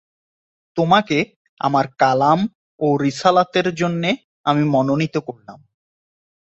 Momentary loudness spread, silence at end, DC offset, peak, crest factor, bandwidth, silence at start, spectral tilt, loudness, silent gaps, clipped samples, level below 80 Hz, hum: 9 LU; 0.95 s; under 0.1%; -2 dBFS; 18 dB; 8.2 kHz; 0.75 s; -6 dB/octave; -19 LUFS; 1.36-1.57 s, 2.55-2.78 s, 4.24-4.44 s; under 0.1%; -60 dBFS; none